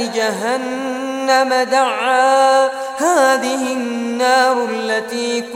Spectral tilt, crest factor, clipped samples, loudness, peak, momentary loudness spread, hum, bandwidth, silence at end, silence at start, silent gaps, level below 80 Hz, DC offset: -2 dB/octave; 14 dB; under 0.1%; -16 LUFS; -2 dBFS; 8 LU; none; 16.5 kHz; 0 s; 0 s; none; -68 dBFS; under 0.1%